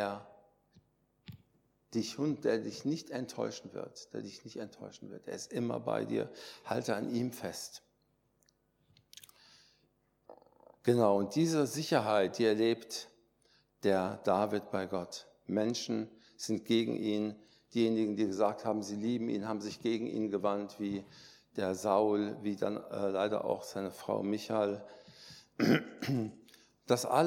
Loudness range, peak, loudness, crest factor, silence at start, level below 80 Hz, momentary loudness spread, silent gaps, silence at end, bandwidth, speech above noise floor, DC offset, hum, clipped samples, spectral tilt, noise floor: 8 LU; -14 dBFS; -34 LUFS; 22 dB; 0 s; -78 dBFS; 16 LU; none; 0 s; 17 kHz; 42 dB; under 0.1%; none; under 0.1%; -5.5 dB/octave; -75 dBFS